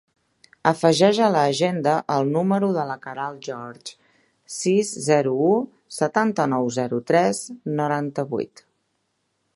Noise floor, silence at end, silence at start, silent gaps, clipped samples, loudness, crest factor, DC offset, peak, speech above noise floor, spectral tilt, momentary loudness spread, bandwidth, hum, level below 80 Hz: -72 dBFS; 1.1 s; 0.65 s; none; under 0.1%; -22 LUFS; 22 dB; under 0.1%; 0 dBFS; 51 dB; -5 dB/octave; 15 LU; 11.5 kHz; none; -70 dBFS